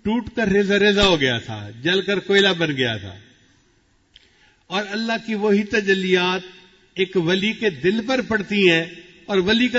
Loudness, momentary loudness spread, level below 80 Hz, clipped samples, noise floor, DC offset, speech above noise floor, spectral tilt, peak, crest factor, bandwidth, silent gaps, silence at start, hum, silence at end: -19 LUFS; 10 LU; -46 dBFS; under 0.1%; -60 dBFS; under 0.1%; 41 dB; -5 dB/octave; -2 dBFS; 18 dB; 8 kHz; none; 0.05 s; none; 0 s